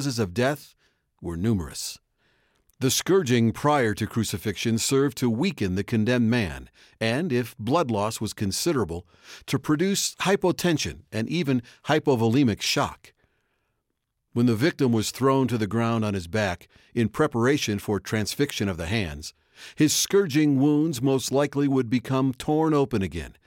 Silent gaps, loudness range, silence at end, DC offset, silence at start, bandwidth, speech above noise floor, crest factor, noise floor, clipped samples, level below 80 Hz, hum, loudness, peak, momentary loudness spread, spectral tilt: none; 3 LU; 0.15 s; under 0.1%; 0 s; 17 kHz; 54 dB; 16 dB; -78 dBFS; under 0.1%; -52 dBFS; none; -24 LUFS; -8 dBFS; 9 LU; -5 dB/octave